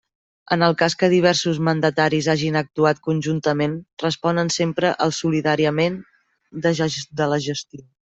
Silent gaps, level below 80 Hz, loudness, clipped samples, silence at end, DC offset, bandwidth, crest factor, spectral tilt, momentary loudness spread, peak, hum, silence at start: 3.93-3.97 s; -58 dBFS; -20 LUFS; under 0.1%; 0.35 s; under 0.1%; 8.2 kHz; 18 dB; -5 dB/octave; 8 LU; -2 dBFS; none; 0.5 s